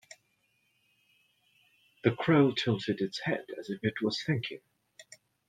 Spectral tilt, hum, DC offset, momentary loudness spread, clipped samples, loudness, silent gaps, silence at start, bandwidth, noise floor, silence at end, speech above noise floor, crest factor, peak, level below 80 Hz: -6.5 dB/octave; none; under 0.1%; 12 LU; under 0.1%; -30 LUFS; none; 2.05 s; 11.5 kHz; -74 dBFS; 0.45 s; 44 dB; 22 dB; -10 dBFS; -70 dBFS